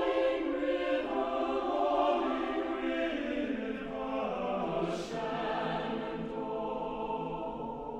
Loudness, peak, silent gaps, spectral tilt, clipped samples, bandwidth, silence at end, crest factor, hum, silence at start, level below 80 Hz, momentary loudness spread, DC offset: -33 LUFS; -16 dBFS; none; -6 dB/octave; under 0.1%; 9.8 kHz; 0 s; 16 dB; none; 0 s; -56 dBFS; 7 LU; under 0.1%